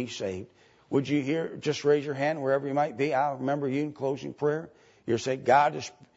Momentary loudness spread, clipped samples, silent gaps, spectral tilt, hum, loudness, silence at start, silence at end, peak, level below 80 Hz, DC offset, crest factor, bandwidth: 11 LU; under 0.1%; none; -6 dB/octave; none; -28 LUFS; 0 s; 0.25 s; -10 dBFS; -72 dBFS; under 0.1%; 18 dB; 8 kHz